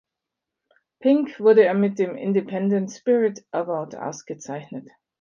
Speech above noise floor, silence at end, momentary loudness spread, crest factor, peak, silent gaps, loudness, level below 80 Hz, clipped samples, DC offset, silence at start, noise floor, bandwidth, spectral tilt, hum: 63 dB; 0.4 s; 17 LU; 18 dB; -4 dBFS; none; -21 LUFS; -74 dBFS; under 0.1%; under 0.1%; 1 s; -85 dBFS; 7.2 kHz; -7 dB/octave; none